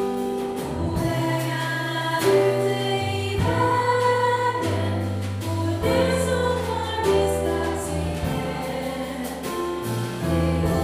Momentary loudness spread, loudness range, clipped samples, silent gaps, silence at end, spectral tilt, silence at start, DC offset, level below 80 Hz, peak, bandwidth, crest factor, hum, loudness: 8 LU; 4 LU; under 0.1%; none; 0 s; -5.5 dB/octave; 0 s; under 0.1%; -40 dBFS; -8 dBFS; 15.5 kHz; 16 dB; none; -24 LUFS